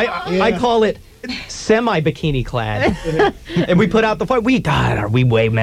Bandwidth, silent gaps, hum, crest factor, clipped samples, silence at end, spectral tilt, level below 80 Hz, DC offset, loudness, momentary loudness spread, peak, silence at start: 13 kHz; none; none; 14 dB; under 0.1%; 0 s; -6.5 dB/octave; -36 dBFS; under 0.1%; -17 LUFS; 7 LU; -2 dBFS; 0 s